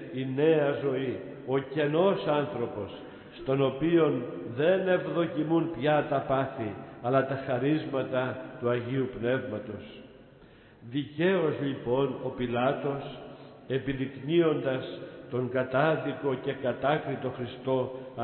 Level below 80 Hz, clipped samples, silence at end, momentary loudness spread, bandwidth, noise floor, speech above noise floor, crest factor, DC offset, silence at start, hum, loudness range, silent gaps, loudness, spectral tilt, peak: -62 dBFS; under 0.1%; 0 s; 12 LU; 4.4 kHz; -54 dBFS; 26 dB; 18 dB; under 0.1%; 0 s; none; 4 LU; none; -29 LUFS; -11 dB/octave; -12 dBFS